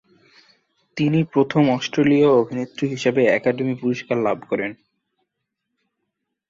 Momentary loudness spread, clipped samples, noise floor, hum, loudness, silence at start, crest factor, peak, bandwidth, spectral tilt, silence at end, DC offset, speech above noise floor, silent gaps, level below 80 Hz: 10 LU; under 0.1%; -79 dBFS; none; -20 LUFS; 0.95 s; 18 dB; -4 dBFS; 7.6 kHz; -7 dB/octave; 1.75 s; under 0.1%; 60 dB; none; -62 dBFS